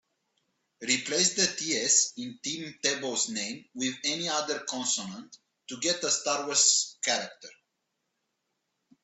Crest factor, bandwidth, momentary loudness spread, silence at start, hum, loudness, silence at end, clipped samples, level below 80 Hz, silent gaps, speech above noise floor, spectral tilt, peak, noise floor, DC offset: 22 dB; 8.6 kHz; 13 LU; 0.8 s; none; -27 LUFS; 1.55 s; under 0.1%; -76 dBFS; none; 51 dB; -0.5 dB/octave; -10 dBFS; -81 dBFS; under 0.1%